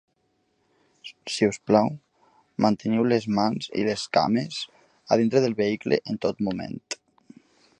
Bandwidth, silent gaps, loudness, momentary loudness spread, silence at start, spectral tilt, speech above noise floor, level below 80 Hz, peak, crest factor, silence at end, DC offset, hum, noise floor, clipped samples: 10.5 kHz; none; -25 LUFS; 15 LU; 1.05 s; -5.5 dB/octave; 47 dB; -62 dBFS; -4 dBFS; 22 dB; 0.85 s; under 0.1%; none; -71 dBFS; under 0.1%